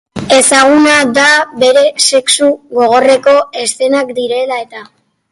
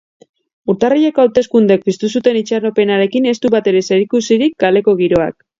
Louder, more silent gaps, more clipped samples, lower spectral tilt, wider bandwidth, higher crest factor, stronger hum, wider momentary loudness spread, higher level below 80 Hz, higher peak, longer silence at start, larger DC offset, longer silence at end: first, -9 LUFS vs -13 LUFS; neither; neither; second, -1.5 dB/octave vs -5.5 dB/octave; first, 12 kHz vs 7.6 kHz; about the same, 10 dB vs 12 dB; neither; first, 9 LU vs 4 LU; about the same, -50 dBFS vs -50 dBFS; about the same, 0 dBFS vs 0 dBFS; second, 0.15 s vs 0.65 s; neither; first, 0.5 s vs 0.3 s